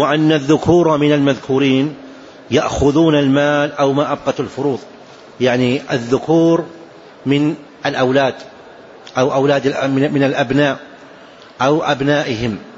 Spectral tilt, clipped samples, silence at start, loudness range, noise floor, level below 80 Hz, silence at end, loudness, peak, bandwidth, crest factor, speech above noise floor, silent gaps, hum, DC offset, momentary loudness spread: -6 dB/octave; under 0.1%; 0 s; 3 LU; -40 dBFS; -44 dBFS; 0 s; -15 LUFS; 0 dBFS; 8 kHz; 14 dB; 25 dB; none; none; under 0.1%; 8 LU